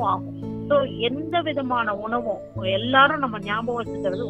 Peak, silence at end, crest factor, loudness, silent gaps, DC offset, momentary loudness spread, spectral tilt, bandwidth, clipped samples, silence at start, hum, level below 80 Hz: -2 dBFS; 0 s; 20 dB; -23 LUFS; none; under 0.1%; 11 LU; -7 dB/octave; 8.4 kHz; under 0.1%; 0 s; none; -52 dBFS